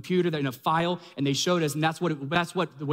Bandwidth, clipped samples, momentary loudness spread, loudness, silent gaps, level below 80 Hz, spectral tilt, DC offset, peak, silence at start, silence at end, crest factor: 16 kHz; under 0.1%; 5 LU; -27 LUFS; none; -66 dBFS; -5 dB/octave; under 0.1%; -10 dBFS; 0 s; 0 s; 16 dB